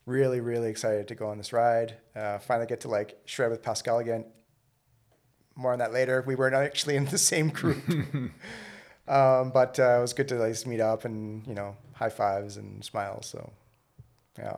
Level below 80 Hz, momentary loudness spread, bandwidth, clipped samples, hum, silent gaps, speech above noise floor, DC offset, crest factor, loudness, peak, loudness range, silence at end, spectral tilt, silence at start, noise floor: -66 dBFS; 15 LU; 15.5 kHz; under 0.1%; none; none; 41 dB; under 0.1%; 18 dB; -28 LUFS; -10 dBFS; 6 LU; 0 s; -4.5 dB/octave; 0.05 s; -69 dBFS